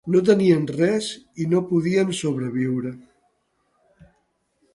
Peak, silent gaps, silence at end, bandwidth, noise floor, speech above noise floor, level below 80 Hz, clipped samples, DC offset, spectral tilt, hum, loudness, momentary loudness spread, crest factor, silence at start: -4 dBFS; none; 1.75 s; 11.5 kHz; -69 dBFS; 48 dB; -62 dBFS; under 0.1%; under 0.1%; -6.5 dB/octave; none; -21 LUFS; 11 LU; 20 dB; 0.05 s